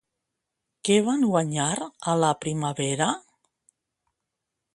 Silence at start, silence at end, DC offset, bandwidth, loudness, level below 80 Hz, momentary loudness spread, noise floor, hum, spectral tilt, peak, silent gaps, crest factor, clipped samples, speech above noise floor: 0.85 s; 1.55 s; under 0.1%; 11.5 kHz; -25 LUFS; -68 dBFS; 7 LU; -83 dBFS; none; -4.5 dB/octave; -8 dBFS; none; 20 dB; under 0.1%; 59 dB